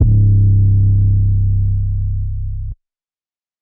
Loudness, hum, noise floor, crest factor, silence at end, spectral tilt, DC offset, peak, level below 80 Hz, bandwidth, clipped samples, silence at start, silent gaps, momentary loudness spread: -15 LUFS; none; under -90 dBFS; 12 dB; 0.85 s; -19.5 dB/octave; under 0.1%; -2 dBFS; -20 dBFS; 0.7 kHz; under 0.1%; 0 s; none; 13 LU